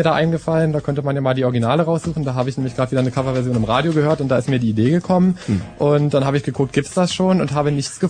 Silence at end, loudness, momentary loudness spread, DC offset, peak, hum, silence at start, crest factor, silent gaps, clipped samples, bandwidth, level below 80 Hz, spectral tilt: 0 s; -18 LUFS; 5 LU; under 0.1%; -2 dBFS; none; 0 s; 14 dB; none; under 0.1%; 9.8 kHz; -46 dBFS; -7 dB/octave